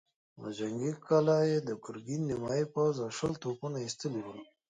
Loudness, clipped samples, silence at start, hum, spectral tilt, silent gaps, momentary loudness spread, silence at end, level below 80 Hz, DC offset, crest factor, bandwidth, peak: -33 LUFS; under 0.1%; 0.35 s; none; -6 dB/octave; none; 13 LU; 0.25 s; -68 dBFS; under 0.1%; 18 dB; 9.4 kHz; -16 dBFS